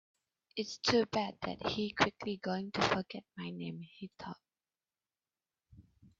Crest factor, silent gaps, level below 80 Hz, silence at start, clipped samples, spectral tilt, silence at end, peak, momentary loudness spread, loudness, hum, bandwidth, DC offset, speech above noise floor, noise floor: 26 dB; none; -68 dBFS; 0.55 s; under 0.1%; -3 dB/octave; 0.1 s; -14 dBFS; 16 LU; -35 LUFS; none; 7.8 kHz; under 0.1%; over 54 dB; under -90 dBFS